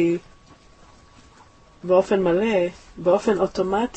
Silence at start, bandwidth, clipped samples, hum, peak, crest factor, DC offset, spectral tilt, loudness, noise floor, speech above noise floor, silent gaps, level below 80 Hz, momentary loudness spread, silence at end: 0 s; 8.6 kHz; under 0.1%; none; -6 dBFS; 18 dB; under 0.1%; -6.5 dB/octave; -21 LUFS; -51 dBFS; 30 dB; none; -52 dBFS; 9 LU; 0.05 s